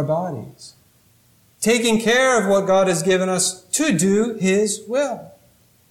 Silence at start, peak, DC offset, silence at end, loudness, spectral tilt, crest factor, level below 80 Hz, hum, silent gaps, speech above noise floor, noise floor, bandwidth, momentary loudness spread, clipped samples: 0 s; -6 dBFS; under 0.1%; 0.6 s; -18 LUFS; -4 dB/octave; 14 dB; -58 dBFS; none; none; 38 dB; -56 dBFS; 16.5 kHz; 9 LU; under 0.1%